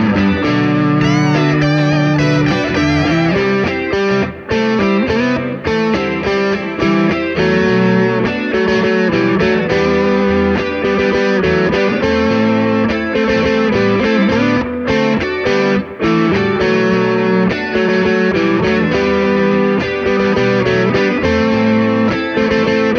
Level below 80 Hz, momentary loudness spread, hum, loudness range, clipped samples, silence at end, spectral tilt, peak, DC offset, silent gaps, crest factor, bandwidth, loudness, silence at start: -38 dBFS; 3 LU; none; 1 LU; under 0.1%; 0 s; -7 dB/octave; 0 dBFS; under 0.1%; none; 12 dB; 7 kHz; -14 LUFS; 0 s